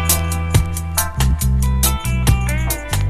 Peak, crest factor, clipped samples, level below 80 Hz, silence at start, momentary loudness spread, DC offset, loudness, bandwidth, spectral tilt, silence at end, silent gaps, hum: -2 dBFS; 16 dB; under 0.1%; -20 dBFS; 0 s; 3 LU; under 0.1%; -18 LUFS; 15.5 kHz; -4 dB/octave; 0 s; none; none